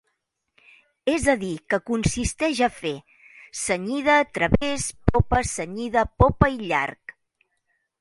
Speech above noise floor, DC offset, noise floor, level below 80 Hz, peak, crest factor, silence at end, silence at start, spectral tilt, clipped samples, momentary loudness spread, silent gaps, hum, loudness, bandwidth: 53 dB; under 0.1%; -76 dBFS; -36 dBFS; 0 dBFS; 24 dB; 0.9 s; 1.05 s; -5 dB/octave; under 0.1%; 11 LU; none; none; -23 LUFS; 11.5 kHz